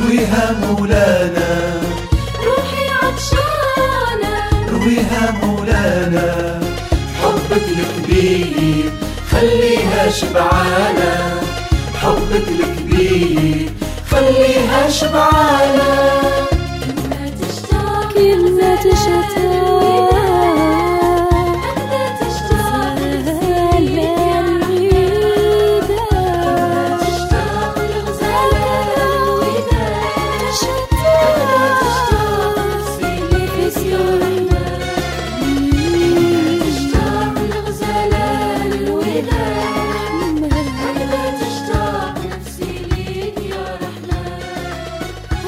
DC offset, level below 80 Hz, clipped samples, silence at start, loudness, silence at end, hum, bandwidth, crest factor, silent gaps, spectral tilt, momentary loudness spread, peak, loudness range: under 0.1%; -26 dBFS; under 0.1%; 0 s; -15 LUFS; 0 s; none; 16 kHz; 14 dB; none; -5.5 dB/octave; 9 LU; 0 dBFS; 5 LU